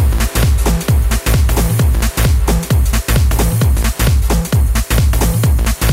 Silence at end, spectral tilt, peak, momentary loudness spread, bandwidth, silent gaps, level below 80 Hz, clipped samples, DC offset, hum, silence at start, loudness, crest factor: 0 s; -5 dB/octave; -4 dBFS; 1 LU; 16.5 kHz; none; -14 dBFS; under 0.1%; under 0.1%; none; 0 s; -14 LUFS; 8 dB